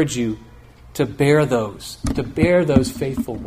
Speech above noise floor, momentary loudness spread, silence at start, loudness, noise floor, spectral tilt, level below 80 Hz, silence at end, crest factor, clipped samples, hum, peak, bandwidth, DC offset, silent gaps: 25 dB; 13 LU; 0 s; -19 LUFS; -43 dBFS; -6 dB/octave; -38 dBFS; 0 s; 18 dB; under 0.1%; none; 0 dBFS; 15.5 kHz; under 0.1%; none